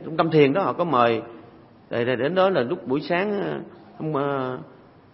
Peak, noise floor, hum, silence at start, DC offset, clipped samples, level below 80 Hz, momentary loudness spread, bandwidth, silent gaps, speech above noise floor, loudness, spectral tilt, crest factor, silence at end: -4 dBFS; -49 dBFS; none; 0 s; under 0.1%; under 0.1%; -66 dBFS; 15 LU; 5.8 kHz; none; 26 dB; -23 LUFS; -11 dB/octave; 20 dB; 0.45 s